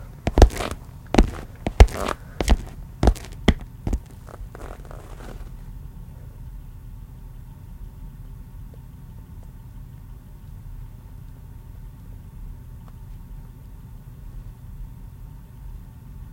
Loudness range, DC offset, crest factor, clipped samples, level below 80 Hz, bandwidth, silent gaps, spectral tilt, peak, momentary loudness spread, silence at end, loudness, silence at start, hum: 19 LU; under 0.1%; 26 dB; under 0.1%; -28 dBFS; 16.5 kHz; none; -6 dB/octave; 0 dBFS; 21 LU; 0 s; -23 LUFS; 0 s; none